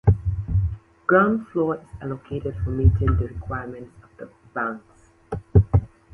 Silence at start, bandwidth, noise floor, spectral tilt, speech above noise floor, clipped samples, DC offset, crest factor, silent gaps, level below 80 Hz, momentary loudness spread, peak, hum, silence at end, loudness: 0.05 s; 3.2 kHz; -43 dBFS; -10.5 dB/octave; 21 dB; under 0.1%; under 0.1%; 20 dB; none; -30 dBFS; 18 LU; -4 dBFS; none; 0.3 s; -23 LUFS